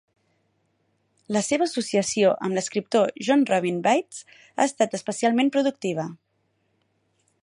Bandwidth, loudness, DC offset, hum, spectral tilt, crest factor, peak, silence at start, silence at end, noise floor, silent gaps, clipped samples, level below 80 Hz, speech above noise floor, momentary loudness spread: 11.5 kHz; -23 LUFS; under 0.1%; none; -4.5 dB/octave; 18 dB; -6 dBFS; 1.3 s; 1.3 s; -71 dBFS; none; under 0.1%; -72 dBFS; 48 dB; 8 LU